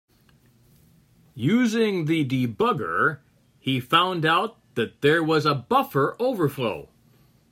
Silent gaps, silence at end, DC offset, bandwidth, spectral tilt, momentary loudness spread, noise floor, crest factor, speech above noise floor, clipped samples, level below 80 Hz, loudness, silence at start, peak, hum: none; 0.65 s; under 0.1%; 16 kHz; -6 dB/octave; 9 LU; -59 dBFS; 20 dB; 36 dB; under 0.1%; -64 dBFS; -23 LUFS; 1.35 s; -4 dBFS; none